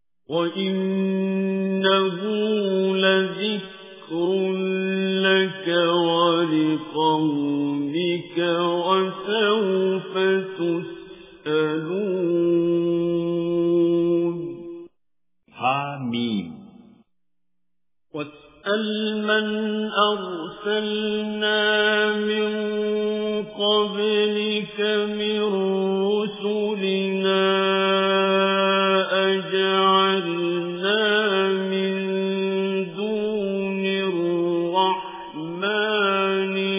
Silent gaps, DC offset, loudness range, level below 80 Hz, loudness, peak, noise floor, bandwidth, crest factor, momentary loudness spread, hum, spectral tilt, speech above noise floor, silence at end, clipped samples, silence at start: none; under 0.1%; 5 LU; -70 dBFS; -22 LUFS; -6 dBFS; -85 dBFS; 3.9 kHz; 18 dB; 7 LU; none; -9.5 dB/octave; 63 dB; 0 s; under 0.1%; 0.3 s